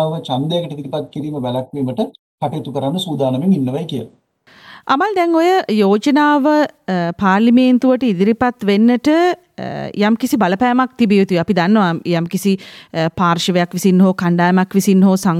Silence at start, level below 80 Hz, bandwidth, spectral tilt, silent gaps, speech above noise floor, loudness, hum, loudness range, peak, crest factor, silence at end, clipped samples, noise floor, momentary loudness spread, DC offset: 0 s; -56 dBFS; 15.5 kHz; -6.5 dB/octave; 2.19-2.38 s; 31 dB; -15 LUFS; none; 6 LU; -2 dBFS; 12 dB; 0 s; under 0.1%; -45 dBFS; 11 LU; under 0.1%